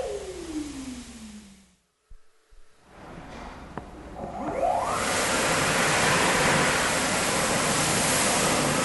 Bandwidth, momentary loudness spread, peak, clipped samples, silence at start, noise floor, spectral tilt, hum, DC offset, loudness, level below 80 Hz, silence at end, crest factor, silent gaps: 12 kHz; 20 LU; -10 dBFS; under 0.1%; 0 s; -63 dBFS; -2.5 dB/octave; none; under 0.1%; -23 LUFS; -48 dBFS; 0 s; 16 dB; none